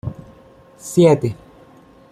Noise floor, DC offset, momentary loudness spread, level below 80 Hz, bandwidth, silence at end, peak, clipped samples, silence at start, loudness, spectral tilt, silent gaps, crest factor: -47 dBFS; under 0.1%; 23 LU; -52 dBFS; 15 kHz; 0.8 s; -2 dBFS; under 0.1%; 0.05 s; -16 LUFS; -7 dB/octave; none; 18 dB